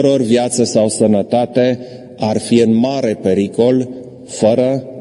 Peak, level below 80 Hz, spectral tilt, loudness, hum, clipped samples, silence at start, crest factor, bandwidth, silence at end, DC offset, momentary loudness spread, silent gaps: 0 dBFS; -56 dBFS; -5.5 dB/octave; -14 LUFS; none; under 0.1%; 0 s; 14 dB; 11.5 kHz; 0 s; under 0.1%; 10 LU; none